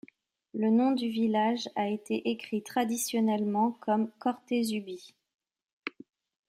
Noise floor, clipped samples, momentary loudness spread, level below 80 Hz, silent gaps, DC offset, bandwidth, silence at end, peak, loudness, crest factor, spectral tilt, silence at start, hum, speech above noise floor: -64 dBFS; under 0.1%; 15 LU; -80 dBFS; 5.35-5.39 s, 5.73-5.82 s; under 0.1%; 16 kHz; 0.6 s; -16 dBFS; -30 LUFS; 16 dB; -5 dB/octave; 0.55 s; none; 35 dB